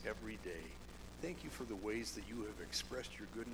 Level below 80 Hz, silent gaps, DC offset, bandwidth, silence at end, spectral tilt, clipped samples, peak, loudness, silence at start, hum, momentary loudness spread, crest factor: -58 dBFS; none; under 0.1%; over 20 kHz; 0 s; -3.5 dB/octave; under 0.1%; -26 dBFS; -46 LUFS; 0 s; none; 8 LU; 20 dB